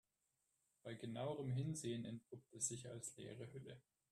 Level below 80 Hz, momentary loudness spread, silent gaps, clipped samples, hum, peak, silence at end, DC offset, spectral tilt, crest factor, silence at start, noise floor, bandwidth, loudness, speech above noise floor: -80 dBFS; 15 LU; none; under 0.1%; none; -28 dBFS; 0.3 s; under 0.1%; -5 dB/octave; 20 dB; 0.85 s; -88 dBFS; 13.5 kHz; -48 LUFS; 40 dB